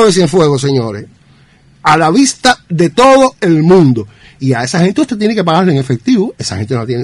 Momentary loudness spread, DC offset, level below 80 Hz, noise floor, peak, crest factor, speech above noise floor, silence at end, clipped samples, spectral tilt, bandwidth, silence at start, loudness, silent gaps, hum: 10 LU; under 0.1%; -44 dBFS; -45 dBFS; 0 dBFS; 10 dB; 35 dB; 0 s; under 0.1%; -5.5 dB/octave; 11.5 kHz; 0 s; -10 LUFS; none; none